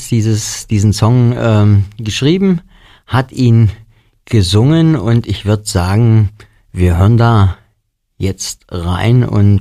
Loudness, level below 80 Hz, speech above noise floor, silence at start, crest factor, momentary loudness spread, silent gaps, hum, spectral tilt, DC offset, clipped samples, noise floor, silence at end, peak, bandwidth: -12 LUFS; -32 dBFS; 52 dB; 0 s; 12 dB; 9 LU; none; none; -6.5 dB/octave; under 0.1%; under 0.1%; -63 dBFS; 0 s; 0 dBFS; 13.5 kHz